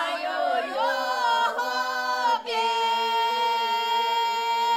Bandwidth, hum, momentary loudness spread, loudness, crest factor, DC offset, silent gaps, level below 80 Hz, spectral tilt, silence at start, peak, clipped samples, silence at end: 16 kHz; none; 3 LU; -24 LUFS; 12 dB; under 0.1%; none; -78 dBFS; 0.5 dB/octave; 0 s; -12 dBFS; under 0.1%; 0 s